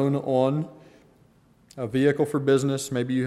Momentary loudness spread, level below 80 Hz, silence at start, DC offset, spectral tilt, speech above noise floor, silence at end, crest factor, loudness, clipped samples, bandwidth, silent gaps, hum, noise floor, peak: 8 LU; -64 dBFS; 0 s; under 0.1%; -6.5 dB/octave; 35 dB; 0 s; 16 dB; -24 LUFS; under 0.1%; 13.5 kHz; none; none; -58 dBFS; -8 dBFS